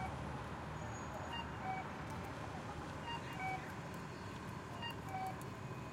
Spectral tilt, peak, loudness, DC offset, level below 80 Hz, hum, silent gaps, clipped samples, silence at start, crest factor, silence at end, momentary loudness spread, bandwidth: -5.5 dB/octave; -30 dBFS; -46 LUFS; under 0.1%; -60 dBFS; none; none; under 0.1%; 0 s; 14 dB; 0 s; 5 LU; 16 kHz